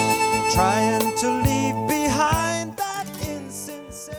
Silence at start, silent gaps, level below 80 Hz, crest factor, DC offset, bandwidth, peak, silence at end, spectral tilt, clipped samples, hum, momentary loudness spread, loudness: 0 s; none; -42 dBFS; 16 dB; under 0.1%; over 20 kHz; -6 dBFS; 0 s; -4 dB/octave; under 0.1%; none; 13 LU; -22 LUFS